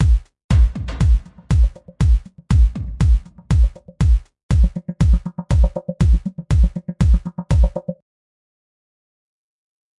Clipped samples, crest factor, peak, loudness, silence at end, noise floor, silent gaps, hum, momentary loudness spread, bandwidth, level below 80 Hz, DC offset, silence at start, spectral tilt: under 0.1%; 14 dB; -4 dBFS; -19 LUFS; 2.05 s; under -90 dBFS; 0.44-0.49 s, 4.43-4.49 s; none; 5 LU; 9.6 kHz; -18 dBFS; under 0.1%; 0 s; -8 dB/octave